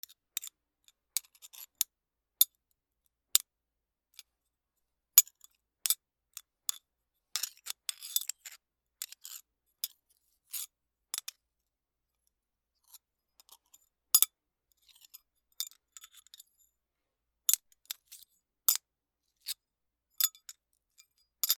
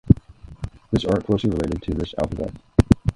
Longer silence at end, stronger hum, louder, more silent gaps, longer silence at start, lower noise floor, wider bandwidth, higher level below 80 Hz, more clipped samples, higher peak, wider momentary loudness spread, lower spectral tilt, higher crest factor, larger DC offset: about the same, 0.05 s vs 0.05 s; neither; second, -31 LUFS vs -23 LUFS; neither; first, 0.4 s vs 0.05 s; first, -88 dBFS vs -41 dBFS; first, 19.5 kHz vs 11.5 kHz; second, -88 dBFS vs -32 dBFS; neither; about the same, 0 dBFS vs 0 dBFS; first, 26 LU vs 14 LU; second, 5.5 dB/octave vs -8 dB/octave; first, 38 dB vs 22 dB; neither